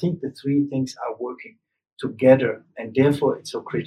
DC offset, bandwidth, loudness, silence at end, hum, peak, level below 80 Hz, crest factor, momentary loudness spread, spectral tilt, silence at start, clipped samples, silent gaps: under 0.1%; 12.5 kHz; -22 LUFS; 0 s; none; -2 dBFS; -66 dBFS; 20 dB; 16 LU; -7 dB/octave; 0 s; under 0.1%; 1.92-1.97 s